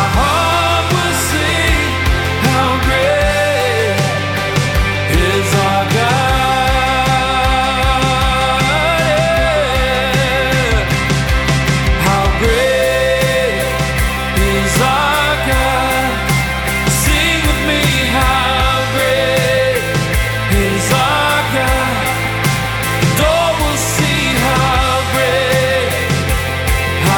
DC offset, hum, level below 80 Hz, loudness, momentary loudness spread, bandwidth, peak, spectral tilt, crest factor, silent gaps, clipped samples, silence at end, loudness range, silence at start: under 0.1%; none; -22 dBFS; -13 LUFS; 3 LU; over 20 kHz; 0 dBFS; -4 dB/octave; 12 dB; none; under 0.1%; 0 s; 1 LU; 0 s